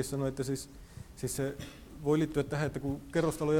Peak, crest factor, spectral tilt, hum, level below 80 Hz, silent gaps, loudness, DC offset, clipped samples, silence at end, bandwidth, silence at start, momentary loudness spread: -16 dBFS; 16 dB; -6 dB/octave; none; -52 dBFS; none; -34 LUFS; under 0.1%; under 0.1%; 0 s; 18.5 kHz; 0 s; 17 LU